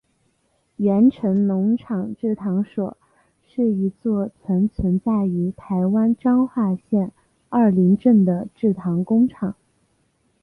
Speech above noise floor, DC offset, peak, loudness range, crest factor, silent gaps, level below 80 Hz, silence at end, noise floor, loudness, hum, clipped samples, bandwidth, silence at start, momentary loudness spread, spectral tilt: 47 dB; under 0.1%; -6 dBFS; 4 LU; 16 dB; none; -48 dBFS; 0.9 s; -66 dBFS; -20 LUFS; none; under 0.1%; 3.7 kHz; 0.8 s; 9 LU; -11.5 dB/octave